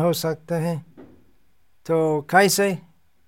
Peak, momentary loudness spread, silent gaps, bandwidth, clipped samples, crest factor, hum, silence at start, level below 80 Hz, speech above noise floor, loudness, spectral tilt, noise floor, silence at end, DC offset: -4 dBFS; 16 LU; none; 17 kHz; under 0.1%; 20 dB; none; 0 s; -68 dBFS; 46 dB; -21 LUFS; -4.5 dB/octave; -66 dBFS; 0.45 s; 0.2%